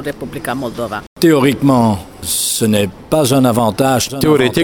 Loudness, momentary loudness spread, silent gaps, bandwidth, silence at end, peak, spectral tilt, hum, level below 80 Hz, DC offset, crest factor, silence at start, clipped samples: -14 LUFS; 10 LU; 1.07-1.16 s; 18 kHz; 0 s; 0 dBFS; -5 dB/octave; none; -42 dBFS; under 0.1%; 14 dB; 0 s; under 0.1%